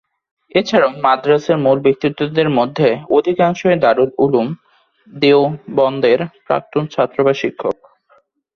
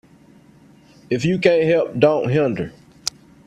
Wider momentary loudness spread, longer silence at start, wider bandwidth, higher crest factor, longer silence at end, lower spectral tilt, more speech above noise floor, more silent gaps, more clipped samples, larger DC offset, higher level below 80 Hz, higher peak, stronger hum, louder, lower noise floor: second, 7 LU vs 12 LU; second, 0.55 s vs 1.1 s; second, 6.8 kHz vs 14 kHz; second, 14 dB vs 20 dB; first, 0.85 s vs 0.35 s; about the same, -6.5 dB/octave vs -5.5 dB/octave; first, 41 dB vs 32 dB; neither; neither; neither; about the same, -58 dBFS vs -54 dBFS; about the same, 0 dBFS vs 0 dBFS; neither; first, -15 LUFS vs -19 LUFS; first, -55 dBFS vs -49 dBFS